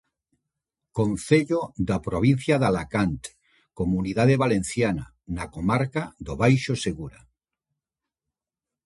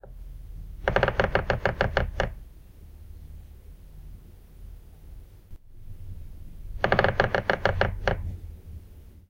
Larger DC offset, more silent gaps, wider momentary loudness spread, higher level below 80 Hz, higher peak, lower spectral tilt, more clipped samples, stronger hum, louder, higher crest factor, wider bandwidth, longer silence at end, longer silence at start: neither; neither; second, 13 LU vs 25 LU; second, -46 dBFS vs -38 dBFS; about the same, -4 dBFS vs -4 dBFS; about the same, -6.5 dB/octave vs -6.5 dB/octave; neither; neither; about the same, -24 LUFS vs -26 LUFS; second, 20 dB vs 26 dB; second, 11.5 kHz vs 16.5 kHz; first, 1.75 s vs 0.1 s; first, 0.95 s vs 0.05 s